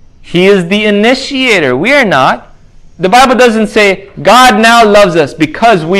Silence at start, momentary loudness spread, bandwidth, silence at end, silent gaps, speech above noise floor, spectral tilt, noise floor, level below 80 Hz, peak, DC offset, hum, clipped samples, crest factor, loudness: 0.25 s; 7 LU; 16 kHz; 0 s; none; 28 dB; -4.5 dB/octave; -35 dBFS; -38 dBFS; 0 dBFS; under 0.1%; none; 5%; 8 dB; -6 LUFS